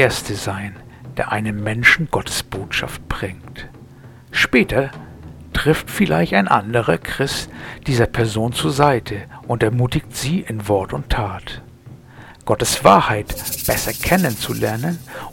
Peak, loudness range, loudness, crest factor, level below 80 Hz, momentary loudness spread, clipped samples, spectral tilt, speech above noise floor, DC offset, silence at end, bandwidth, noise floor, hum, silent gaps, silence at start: 0 dBFS; 4 LU; -19 LUFS; 20 dB; -36 dBFS; 16 LU; under 0.1%; -4.5 dB/octave; 23 dB; under 0.1%; 0 s; 18.5 kHz; -41 dBFS; none; none; 0 s